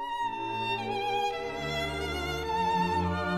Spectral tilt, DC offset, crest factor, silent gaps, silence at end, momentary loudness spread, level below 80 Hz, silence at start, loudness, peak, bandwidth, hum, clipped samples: -5 dB/octave; 0.1%; 14 dB; none; 0 s; 5 LU; -48 dBFS; 0 s; -31 LUFS; -18 dBFS; 15 kHz; none; under 0.1%